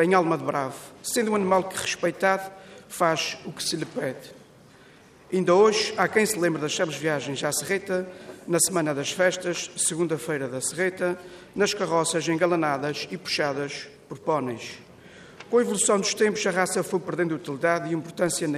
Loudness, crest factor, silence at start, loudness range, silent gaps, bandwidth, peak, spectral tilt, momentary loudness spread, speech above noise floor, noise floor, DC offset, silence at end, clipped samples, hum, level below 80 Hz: -25 LUFS; 20 dB; 0 s; 4 LU; none; 15.5 kHz; -6 dBFS; -3.5 dB/octave; 11 LU; 27 dB; -52 dBFS; under 0.1%; 0 s; under 0.1%; none; -68 dBFS